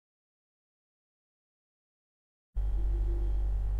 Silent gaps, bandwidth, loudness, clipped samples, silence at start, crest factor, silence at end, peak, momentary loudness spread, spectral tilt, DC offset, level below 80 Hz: none; 2 kHz; -35 LUFS; under 0.1%; 2.55 s; 14 dB; 0 s; -20 dBFS; 5 LU; -9 dB/octave; under 0.1%; -34 dBFS